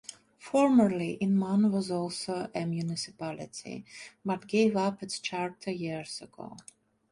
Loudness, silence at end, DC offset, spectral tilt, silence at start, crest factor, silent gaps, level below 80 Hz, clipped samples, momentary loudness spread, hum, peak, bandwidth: -30 LUFS; 0.5 s; under 0.1%; -6 dB/octave; 0.1 s; 18 dB; none; -70 dBFS; under 0.1%; 19 LU; none; -12 dBFS; 11.5 kHz